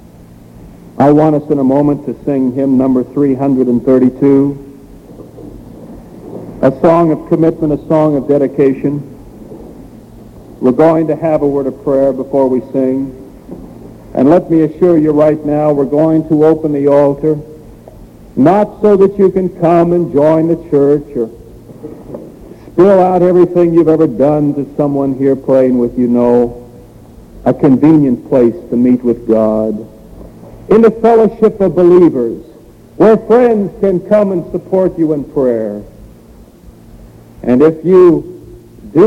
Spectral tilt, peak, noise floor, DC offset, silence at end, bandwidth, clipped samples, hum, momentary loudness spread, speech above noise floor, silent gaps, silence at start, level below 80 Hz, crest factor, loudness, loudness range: -10 dB/octave; 0 dBFS; -38 dBFS; under 0.1%; 0 s; 9.2 kHz; under 0.1%; none; 14 LU; 28 dB; none; 0.6 s; -40 dBFS; 12 dB; -11 LUFS; 4 LU